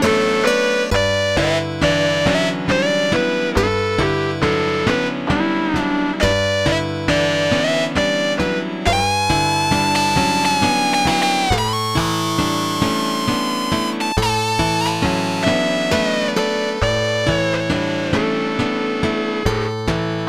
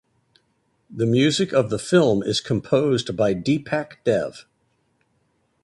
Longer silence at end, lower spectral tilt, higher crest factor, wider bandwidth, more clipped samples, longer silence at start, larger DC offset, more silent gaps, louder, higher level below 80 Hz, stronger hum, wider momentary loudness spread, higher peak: second, 0 s vs 1.2 s; about the same, -4.5 dB/octave vs -5.5 dB/octave; about the same, 18 dB vs 18 dB; first, 16.5 kHz vs 11.5 kHz; neither; second, 0 s vs 0.9 s; first, 0.6% vs under 0.1%; neither; first, -18 LUFS vs -21 LUFS; first, -36 dBFS vs -56 dBFS; neither; second, 4 LU vs 7 LU; first, 0 dBFS vs -4 dBFS